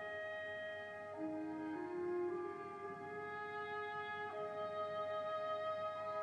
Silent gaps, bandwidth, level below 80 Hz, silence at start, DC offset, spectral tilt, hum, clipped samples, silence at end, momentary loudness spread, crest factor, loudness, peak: none; 10.5 kHz; -84 dBFS; 0 s; under 0.1%; -6 dB/octave; none; under 0.1%; 0 s; 6 LU; 12 dB; -44 LUFS; -32 dBFS